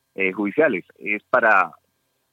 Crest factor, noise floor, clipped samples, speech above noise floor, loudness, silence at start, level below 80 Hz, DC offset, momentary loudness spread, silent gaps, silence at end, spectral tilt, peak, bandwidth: 18 dB; -70 dBFS; under 0.1%; 50 dB; -20 LUFS; 0.2 s; -76 dBFS; under 0.1%; 10 LU; none; 0.65 s; -7 dB/octave; -4 dBFS; 7.8 kHz